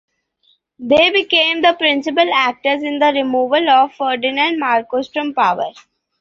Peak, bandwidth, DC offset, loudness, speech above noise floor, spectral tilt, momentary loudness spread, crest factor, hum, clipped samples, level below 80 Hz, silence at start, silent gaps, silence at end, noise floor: 0 dBFS; 7.4 kHz; under 0.1%; -15 LUFS; 45 dB; -4 dB/octave; 8 LU; 16 dB; none; under 0.1%; -60 dBFS; 0.8 s; none; 0.4 s; -60 dBFS